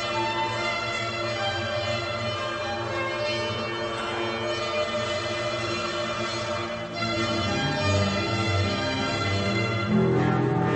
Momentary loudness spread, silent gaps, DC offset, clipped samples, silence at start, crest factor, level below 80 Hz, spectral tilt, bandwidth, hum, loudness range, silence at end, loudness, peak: 5 LU; none; under 0.1%; under 0.1%; 0 s; 16 dB; -52 dBFS; -5 dB/octave; 9 kHz; none; 3 LU; 0 s; -26 LUFS; -10 dBFS